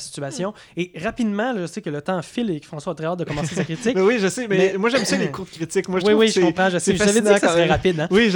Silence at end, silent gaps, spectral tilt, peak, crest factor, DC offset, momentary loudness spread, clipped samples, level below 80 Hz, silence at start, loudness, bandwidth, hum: 0 s; none; -4.5 dB/octave; -2 dBFS; 18 dB; under 0.1%; 12 LU; under 0.1%; -48 dBFS; 0 s; -20 LUFS; 18.5 kHz; none